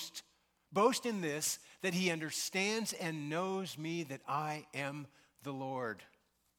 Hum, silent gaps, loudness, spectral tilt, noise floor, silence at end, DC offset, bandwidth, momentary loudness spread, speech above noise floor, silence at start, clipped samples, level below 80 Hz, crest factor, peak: none; none; -37 LUFS; -3.5 dB/octave; -74 dBFS; 0.55 s; under 0.1%; 18 kHz; 14 LU; 37 dB; 0 s; under 0.1%; -82 dBFS; 22 dB; -18 dBFS